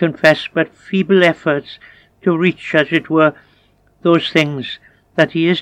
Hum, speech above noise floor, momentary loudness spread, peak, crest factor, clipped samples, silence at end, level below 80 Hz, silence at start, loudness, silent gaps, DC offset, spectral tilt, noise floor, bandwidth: none; 40 dB; 10 LU; 0 dBFS; 16 dB; under 0.1%; 0 s; -60 dBFS; 0 s; -15 LUFS; none; under 0.1%; -6.5 dB/octave; -54 dBFS; 12 kHz